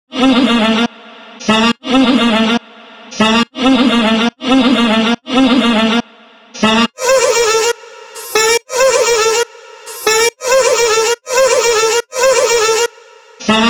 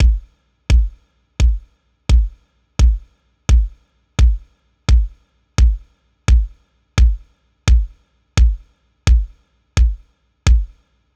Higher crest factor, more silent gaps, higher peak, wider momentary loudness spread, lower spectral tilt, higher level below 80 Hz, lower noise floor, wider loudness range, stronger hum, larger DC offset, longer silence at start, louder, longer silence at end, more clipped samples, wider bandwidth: about the same, 12 dB vs 16 dB; neither; about the same, 0 dBFS vs -2 dBFS; second, 7 LU vs 13 LU; second, -2.5 dB/octave vs -5.5 dB/octave; second, -46 dBFS vs -16 dBFS; second, -42 dBFS vs -50 dBFS; about the same, 2 LU vs 1 LU; neither; neither; about the same, 0.1 s vs 0 s; first, -12 LUFS vs -19 LUFS; second, 0 s vs 0.5 s; neither; first, over 20 kHz vs 8.4 kHz